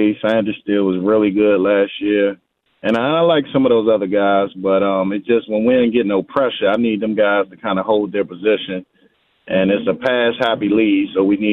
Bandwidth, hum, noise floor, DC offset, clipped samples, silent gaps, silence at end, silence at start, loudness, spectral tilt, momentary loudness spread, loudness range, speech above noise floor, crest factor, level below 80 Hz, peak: 4.9 kHz; none; -57 dBFS; under 0.1%; under 0.1%; none; 0 s; 0 s; -16 LUFS; -8 dB/octave; 5 LU; 3 LU; 41 dB; 14 dB; -56 dBFS; -2 dBFS